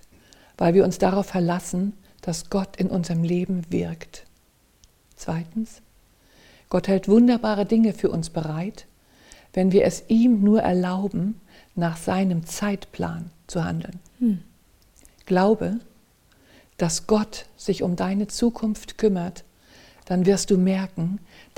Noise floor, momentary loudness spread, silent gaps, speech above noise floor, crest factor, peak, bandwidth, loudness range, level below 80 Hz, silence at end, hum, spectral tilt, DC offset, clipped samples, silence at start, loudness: -60 dBFS; 13 LU; none; 38 dB; 18 dB; -4 dBFS; 16.5 kHz; 6 LU; -48 dBFS; 0.35 s; none; -6.5 dB/octave; under 0.1%; under 0.1%; 0.6 s; -23 LUFS